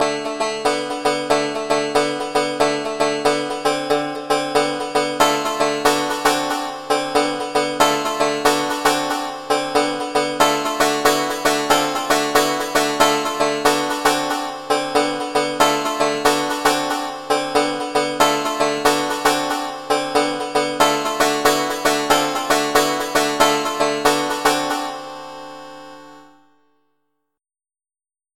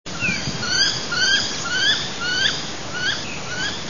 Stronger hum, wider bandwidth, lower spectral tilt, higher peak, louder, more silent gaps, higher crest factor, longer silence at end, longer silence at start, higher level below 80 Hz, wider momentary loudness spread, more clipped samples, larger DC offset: neither; first, 17 kHz vs 7.4 kHz; about the same, -2.5 dB/octave vs -1.5 dB/octave; first, 0 dBFS vs -6 dBFS; about the same, -18 LUFS vs -20 LUFS; neither; about the same, 20 dB vs 18 dB; first, 2.1 s vs 0 s; about the same, 0 s vs 0.05 s; about the same, -52 dBFS vs -48 dBFS; second, 5 LU vs 8 LU; neither; second, under 0.1% vs 2%